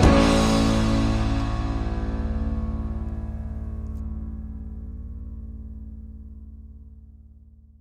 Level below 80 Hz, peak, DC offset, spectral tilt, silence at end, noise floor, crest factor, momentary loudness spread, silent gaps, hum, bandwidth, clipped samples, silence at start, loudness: -28 dBFS; -4 dBFS; under 0.1%; -6 dB/octave; 0.55 s; -49 dBFS; 22 dB; 22 LU; none; none; 13 kHz; under 0.1%; 0 s; -25 LUFS